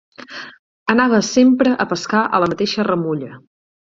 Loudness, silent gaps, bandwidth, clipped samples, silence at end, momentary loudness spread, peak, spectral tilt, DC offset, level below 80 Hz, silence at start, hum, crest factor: -16 LUFS; 0.59-0.86 s; 7.8 kHz; under 0.1%; 0.6 s; 20 LU; -2 dBFS; -5 dB/octave; under 0.1%; -56 dBFS; 0.2 s; none; 16 dB